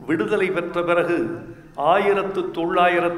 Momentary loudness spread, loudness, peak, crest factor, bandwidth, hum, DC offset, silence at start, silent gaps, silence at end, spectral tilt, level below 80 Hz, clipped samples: 9 LU; -21 LUFS; -4 dBFS; 16 dB; 12.5 kHz; none; under 0.1%; 0 s; none; 0 s; -6.5 dB/octave; -54 dBFS; under 0.1%